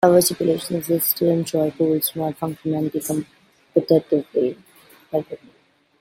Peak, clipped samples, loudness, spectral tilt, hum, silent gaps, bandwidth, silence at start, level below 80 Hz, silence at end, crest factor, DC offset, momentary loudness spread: -2 dBFS; under 0.1%; -21 LUFS; -5.5 dB/octave; none; none; 16.5 kHz; 0 s; -62 dBFS; 0.65 s; 20 dB; under 0.1%; 9 LU